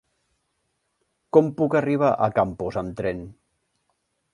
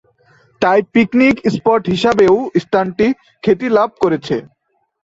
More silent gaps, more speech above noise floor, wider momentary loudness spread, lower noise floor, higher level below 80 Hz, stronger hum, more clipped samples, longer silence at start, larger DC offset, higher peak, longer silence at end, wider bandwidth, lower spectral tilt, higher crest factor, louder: neither; first, 52 dB vs 39 dB; first, 9 LU vs 6 LU; first, -74 dBFS vs -52 dBFS; about the same, -54 dBFS vs -50 dBFS; neither; neither; first, 1.35 s vs 0.6 s; neither; about the same, -2 dBFS vs 0 dBFS; first, 1 s vs 0.6 s; first, 10.5 kHz vs 8 kHz; first, -8.5 dB/octave vs -6.5 dB/octave; first, 22 dB vs 14 dB; second, -22 LUFS vs -14 LUFS